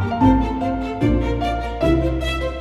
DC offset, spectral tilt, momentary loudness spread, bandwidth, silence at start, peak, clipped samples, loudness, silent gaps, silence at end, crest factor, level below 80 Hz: under 0.1%; -7.5 dB/octave; 7 LU; 12.5 kHz; 0 s; -2 dBFS; under 0.1%; -20 LUFS; none; 0 s; 16 dB; -26 dBFS